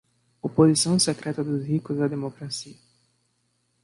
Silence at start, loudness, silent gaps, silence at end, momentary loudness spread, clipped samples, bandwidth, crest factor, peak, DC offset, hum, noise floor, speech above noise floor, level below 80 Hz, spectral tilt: 0.45 s; -24 LUFS; none; 1.1 s; 15 LU; under 0.1%; 11.5 kHz; 20 dB; -6 dBFS; under 0.1%; 60 Hz at -50 dBFS; -71 dBFS; 48 dB; -64 dBFS; -5 dB/octave